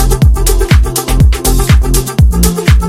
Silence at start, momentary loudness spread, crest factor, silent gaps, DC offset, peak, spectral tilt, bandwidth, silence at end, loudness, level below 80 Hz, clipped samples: 0 s; 3 LU; 8 dB; none; under 0.1%; 0 dBFS; -5 dB/octave; 17 kHz; 0 s; -10 LUFS; -10 dBFS; 2%